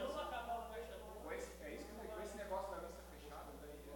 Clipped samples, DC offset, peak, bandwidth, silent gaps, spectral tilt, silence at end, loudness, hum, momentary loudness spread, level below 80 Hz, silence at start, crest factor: under 0.1%; under 0.1%; -32 dBFS; 18 kHz; none; -4.5 dB/octave; 0 s; -49 LUFS; 60 Hz at -60 dBFS; 9 LU; -60 dBFS; 0 s; 18 dB